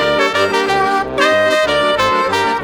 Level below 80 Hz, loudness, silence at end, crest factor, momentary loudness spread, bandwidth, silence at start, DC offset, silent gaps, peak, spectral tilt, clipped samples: -44 dBFS; -13 LUFS; 0 s; 14 dB; 2 LU; over 20 kHz; 0 s; under 0.1%; none; 0 dBFS; -3.5 dB/octave; under 0.1%